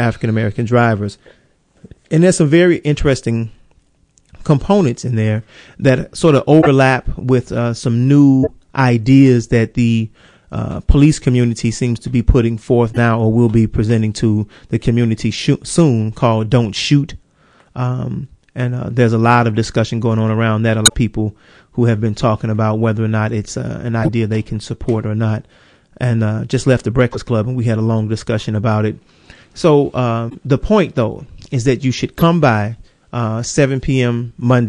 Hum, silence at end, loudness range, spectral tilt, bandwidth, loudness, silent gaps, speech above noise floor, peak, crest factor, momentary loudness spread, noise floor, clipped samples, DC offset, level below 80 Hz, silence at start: none; 0 s; 5 LU; -6.5 dB/octave; 12 kHz; -15 LUFS; none; 41 dB; 0 dBFS; 14 dB; 11 LU; -55 dBFS; under 0.1%; under 0.1%; -32 dBFS; 0 s